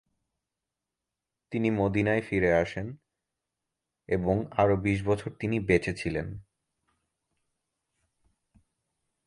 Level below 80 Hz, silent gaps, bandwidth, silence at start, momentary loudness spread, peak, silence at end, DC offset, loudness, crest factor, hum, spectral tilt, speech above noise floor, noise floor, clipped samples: -50 dBFS; none; 11 kHz; 1.5 s; 11 LU; -10 dBFS; 2.85 s; under 0.1%; -28 LUFS; 22 dB; none; -7.5 dB/octave; 61 dB; -88 dBFS; under 0.1%